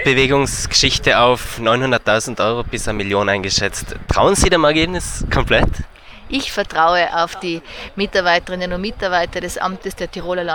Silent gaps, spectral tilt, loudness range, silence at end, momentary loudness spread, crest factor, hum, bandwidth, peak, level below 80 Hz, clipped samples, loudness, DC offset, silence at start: none; -3.5 dB/octave; 3 LU; 0 s; 11 LU; 16 dB; none; 19.5 kHz; -2 dBFS; -30 dBFS; under 0.1%; -17 LUFS; under 0.1%; 0 s